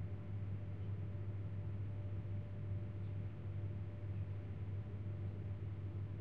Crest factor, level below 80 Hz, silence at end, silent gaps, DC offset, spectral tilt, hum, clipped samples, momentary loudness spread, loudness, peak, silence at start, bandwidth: 10 dB; -58 dBFS; 0 s; none; 0.2%; -9.5 dB/octave; none; under 0.1%; 1 LU; -46 LUFS; -34 dBFS; 0 s; 3.8 kHz